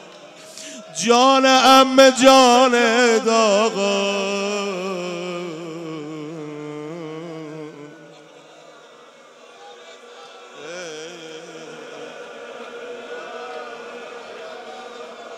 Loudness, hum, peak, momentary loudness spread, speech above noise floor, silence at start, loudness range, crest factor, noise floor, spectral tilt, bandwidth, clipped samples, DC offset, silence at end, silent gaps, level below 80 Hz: -15 LUFS; none; -2 dBFS; 24 LU; 31 dB; 0.15 s; 24 LU; 18 dB; -46 dBFS; -2.5 dB/octave; 16 kHz; under 0.1%; under 0.1%; 0 s; none; -68 dBFS